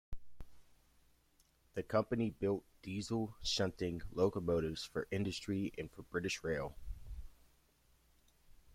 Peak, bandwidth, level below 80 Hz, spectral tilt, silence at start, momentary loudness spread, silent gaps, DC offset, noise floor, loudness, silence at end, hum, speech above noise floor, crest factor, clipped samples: -20 dBFS; 16.5 kHz; -56 dBFS; -5 dB/octave; 0.1 s; 16 LU; none; under 0.1%; -72 dBFS; -39 LUFS; 0.25 s; none; 34 dB; 20 dB; under 0.1%